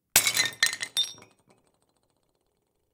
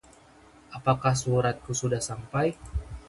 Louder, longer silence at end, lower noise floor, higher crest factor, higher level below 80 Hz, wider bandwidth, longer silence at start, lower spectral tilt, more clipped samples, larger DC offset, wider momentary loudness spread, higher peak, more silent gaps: first, -25 LUFS vs -28 LUFS; first, 1.8 s vs 0.05 s; first, -75 dBFS vs -55 dBFS; first, 26 dB vs 20 dB; second, -66 dBFS vs -44 dBFS; first, 18 kHz vs 11.5 kHz; second, 0.15 s vs 0.7 s; second, 1.5 dB/octave vs -5 dB/octave; neither; neither; second, 7 LU vs 11 LU; first, -4 dBFS vs -8 dBFS; neither